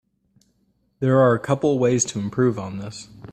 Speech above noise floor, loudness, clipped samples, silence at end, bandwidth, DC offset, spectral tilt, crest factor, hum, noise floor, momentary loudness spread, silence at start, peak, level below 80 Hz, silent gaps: 46 dB; -20 LUFS; under 0.1%; 0.05 s; 9.4 kHz; under 0.1%; -5.5 dB/octave; 18 dB; none; -66 dBFS; 16 LU; 1 s; -4 dBFS; -58 dBFS; none